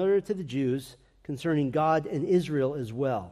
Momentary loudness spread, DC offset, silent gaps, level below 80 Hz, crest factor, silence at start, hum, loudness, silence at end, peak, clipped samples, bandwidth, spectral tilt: 10 LU; under 0.1%; none; -62 dBFS; 14 dB; 0 s; none; -28 LUFS; 0 s; -14 dBFS; under 0.1%; 14 kHz; -7.5 dB/octave